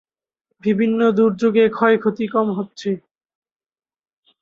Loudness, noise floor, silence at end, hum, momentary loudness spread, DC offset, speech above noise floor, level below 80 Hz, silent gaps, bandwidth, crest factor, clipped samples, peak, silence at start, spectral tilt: -18 LUFS; under -90 dBFS; 1.45 s; none; 10 LU; under 0.1%; over 73 dB; -64 dBFS; none; 7.2 kHz; 18 dB; under 0.1%; -2 dBFS; 0.65 s; -7.5 dB/octave